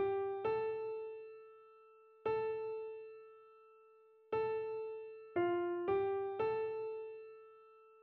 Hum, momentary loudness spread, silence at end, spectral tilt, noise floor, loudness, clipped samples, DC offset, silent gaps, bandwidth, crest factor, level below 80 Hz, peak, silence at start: none; 21 LU; 0.05 s; -5 dB/octave; -65 dBFS; -40 LUFS; under 0.1%; under 0.1%; none; 4.3 kHz; 16 dB; -76 dBFS; -24 dBFS; 0 s